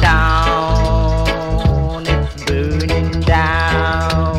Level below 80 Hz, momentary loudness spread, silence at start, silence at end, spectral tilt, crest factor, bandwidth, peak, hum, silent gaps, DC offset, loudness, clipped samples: -18 dBFS; 5 LU; 0 s; 0 s; -6 dB/octave; 14 dB; 12.5 kHz; 0 dBFS; none; none; under 0.1%; -16 LUFS; under 0.1%